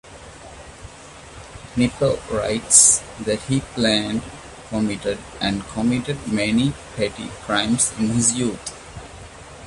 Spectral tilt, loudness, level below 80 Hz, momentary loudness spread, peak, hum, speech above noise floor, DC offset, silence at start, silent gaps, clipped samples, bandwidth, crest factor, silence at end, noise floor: -3 dB/octave; -19 LUFS; -44 dBFS; 23 LU; 0 dBFS; none; 20 dB; under 0.1%; 0.05 s; none; under 0.1%; 11.5 kHz; 22 dB; 0 s; -41 dBFS